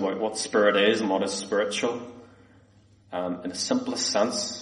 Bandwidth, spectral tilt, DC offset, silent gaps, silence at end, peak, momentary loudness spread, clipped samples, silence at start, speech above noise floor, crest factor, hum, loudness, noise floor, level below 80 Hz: 11.5 kHz; -3 dB/octave; under 0.1%; none; 0 s; -8 dBFS; 11 LU; under 0.1%; 0 s; 32 dB; 18 dB; none; -25 LUFS; -57 dBFS; -68 dBFS